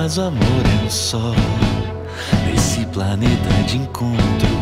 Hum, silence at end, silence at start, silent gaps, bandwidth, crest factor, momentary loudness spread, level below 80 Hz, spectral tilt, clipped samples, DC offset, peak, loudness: none; 0 s; 0 s; none; 15.5 kHz; 14 dB; 5 LU; -28 dBFS; -5.5 dB/octave; under 0.1%; under 0.1%; -4 dBFS; -18 LUFS